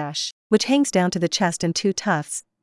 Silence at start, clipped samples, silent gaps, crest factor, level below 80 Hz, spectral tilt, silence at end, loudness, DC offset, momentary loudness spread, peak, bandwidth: 0 s; under 0.1%; 0.32-0.50 s; 20 dB; -62 dBFS; -4 dB/octave; 0.2 s; -21 LUFS; under 0.1%; 8 LU; -2 dBFS; 12 kHz